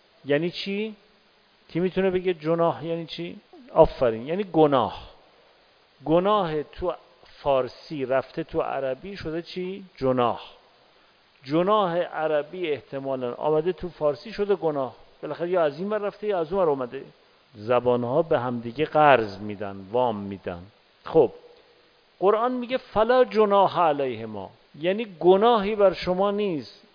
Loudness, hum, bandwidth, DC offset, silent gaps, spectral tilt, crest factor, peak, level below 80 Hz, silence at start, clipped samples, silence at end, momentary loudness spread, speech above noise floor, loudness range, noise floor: -24 LUFS; none; 5.2 kHz; under 0.1%; none; -8 dB/octave; 22 dB; -2 dBFS; -52 dBFS; 0.25 s; under 0.1%; 0.25 s; 14 LU; 36 dB; 5 LU; -60 dBFS